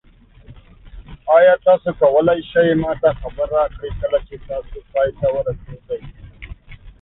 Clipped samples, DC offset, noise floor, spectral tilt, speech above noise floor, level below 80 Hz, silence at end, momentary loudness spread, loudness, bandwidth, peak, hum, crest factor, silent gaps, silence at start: under 0.1%; under 0.1%; -44 dBFS; -11 dB/octave; 27 dB; -38 dBFS; 0.1 s; 17 LU; -17 LUFS; 4 kHz; -2 dBFS; none; 16 dB; none; 0.5 s